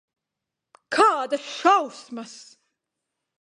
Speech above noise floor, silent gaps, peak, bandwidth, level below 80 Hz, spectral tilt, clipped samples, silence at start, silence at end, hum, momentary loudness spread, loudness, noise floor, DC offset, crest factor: 61 dB; none; -4 dBFS; 11.5 kHz; -78 dBFS; -2 dB/octave; under 0.1%; 0.9 s; 1 s; none; 18 LU; -21 LUFS; -85 dBFS; under 0.1%; 22 dB